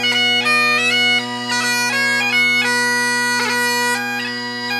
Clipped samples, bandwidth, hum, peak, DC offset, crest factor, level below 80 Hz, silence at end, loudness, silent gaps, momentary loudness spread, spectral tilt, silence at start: under 0.1%; 16 kHz; none; -4 dBFS; under 0.1%; 14 dB; -70 dBFS; 0 s; -15 LUFS; none; 7 LU; -1 dB/octave; 0 s